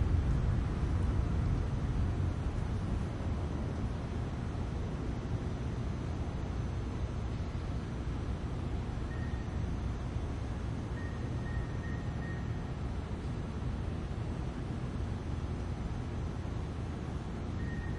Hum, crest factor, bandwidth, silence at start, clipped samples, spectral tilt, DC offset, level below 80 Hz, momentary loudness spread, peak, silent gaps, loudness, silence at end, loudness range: none; 16 dB; 10.5 kHz; 0 s; under 0.1%; -7.5 dB/octave; under 0.1%; -40 dBFS; 5 LU; -18 dBFS; none; -37 LUFS; 0 s; 4 LU